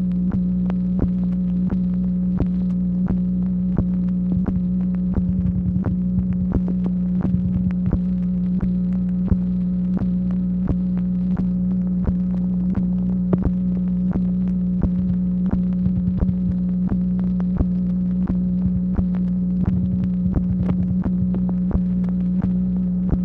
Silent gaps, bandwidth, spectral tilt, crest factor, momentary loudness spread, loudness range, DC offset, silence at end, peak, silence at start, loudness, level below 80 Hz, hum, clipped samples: none; 2.5 kHz; -12.5 dB/octave; 14 dB; 1 LU; 0 LU; under 0.1%; 0 s; -6 dBFS; 0 s; -21 LUFS; -32 dBFS; 60 Hz at -30 dBFS; under 0.1%